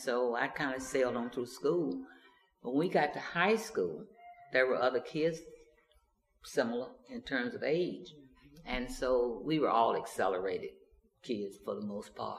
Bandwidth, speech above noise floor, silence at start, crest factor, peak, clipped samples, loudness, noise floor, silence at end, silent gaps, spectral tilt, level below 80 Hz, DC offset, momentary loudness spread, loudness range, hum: 15 kHz; 39 dB; 0 s; 22 dB; -14 dBFS; under 0.1%; -34 LUFS; -72 dBFS; 0 s; none; -5 dB/octave; -60 dBFS; under 0.1%; 16 LU; 4 LU; none